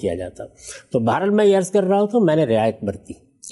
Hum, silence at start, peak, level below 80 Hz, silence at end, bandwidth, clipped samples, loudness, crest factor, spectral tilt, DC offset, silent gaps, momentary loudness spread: none; 0 s; -6 dBFS; -56 dBFS; 0 s; 11.5 kHz; under 0.1%; -19 LUFS; 12 dB; -6.5 dB/octave; under 0.1%; none; 20 LU